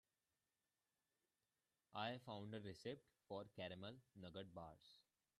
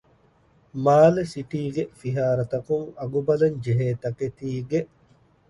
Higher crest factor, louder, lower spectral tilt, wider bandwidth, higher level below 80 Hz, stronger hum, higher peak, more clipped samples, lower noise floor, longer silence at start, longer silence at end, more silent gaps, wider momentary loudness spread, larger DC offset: about the same, 22 dB vs 20 dB; second, -55 LUFS vs -24 LUFS; second, -6 dB/octave vs -8 dB/octave; first, 13 kHz vs 11.5 kHz; second, -86 dBFS vs -56 dBFS; neither; second, -34 dBFS vs -4 dBFS; neither; first, under -90 dBFS vs -60 dBFS; first, 1.9 s vs 0.75 s; second, 0.4 s vs 0.65 s; neither; second, 10 LU vs 13 LU; neither